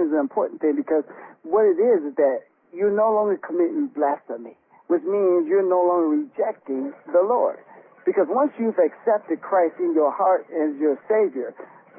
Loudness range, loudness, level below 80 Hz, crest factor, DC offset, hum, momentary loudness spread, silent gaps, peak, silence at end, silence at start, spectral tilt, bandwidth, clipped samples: 1 LU; -22 LUFS; -78 dBFS; 14 dB; under 0.1%; none; 10 LU; none; -8 dBFS; 0.35 s; 0 s; -12 dB/octave; 2.9 kHz; under 0.1%